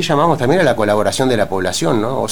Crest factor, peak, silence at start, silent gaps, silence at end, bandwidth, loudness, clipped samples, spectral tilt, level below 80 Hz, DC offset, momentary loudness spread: 14 dB; 0 dBFS; 0 s; none; 0 s; over 20 kHz; -15 LUFS; under 0.1%; -5 dB/octave; -44 dBFS; 3%; 4 LU